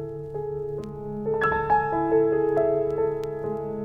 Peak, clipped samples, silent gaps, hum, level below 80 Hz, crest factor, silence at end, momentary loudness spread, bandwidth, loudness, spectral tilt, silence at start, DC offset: -10 dBFS; under 0.1%; none; none; -50 dBFS; 16 dB; 0 s; 11 LU; 5.4 kHz; -25 LUFS; -8.5 dB/octave; 0 s; under 0.1%